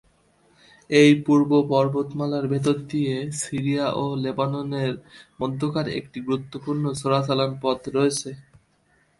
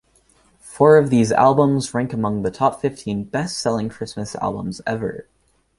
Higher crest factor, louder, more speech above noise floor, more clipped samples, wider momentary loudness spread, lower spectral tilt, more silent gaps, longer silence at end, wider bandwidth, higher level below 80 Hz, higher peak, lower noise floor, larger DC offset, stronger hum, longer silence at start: about the same, 18 dB vs 18 dB; second, -23 LUFS vs -19 LUFS; about the same, 41 dB vs 39 dB; neither; second, 11 LU vs 14 LU; about the same, -6 dB/octave vs -6 dB/octave; neither; first, 0.8 s vs 0.55 s; about the same, 11.5 kHz vs 11.5 kHz; second, -60 dBFS vs -52 dBFS; about the same, -4 dBFS vs -2 dBFS; first, -63 dBFS vs -58 dBFS; neither; neither; first, 0.9 s vs 0.65 s